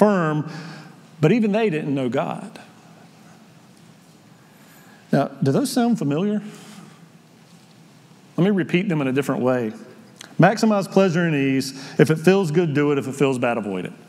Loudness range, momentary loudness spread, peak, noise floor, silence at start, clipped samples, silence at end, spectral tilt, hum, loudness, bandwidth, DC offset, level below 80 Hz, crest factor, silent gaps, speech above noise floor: 8 LU; 17 LU; 0 dBFS; -49 dBFS; 0 s; under 0.1%; 0.15 s; -6.5 dB/octave; none; -20 LUFS; 14.5 kHz; under 0.1%; -76 dBFS; 22 dB; none; 30 dB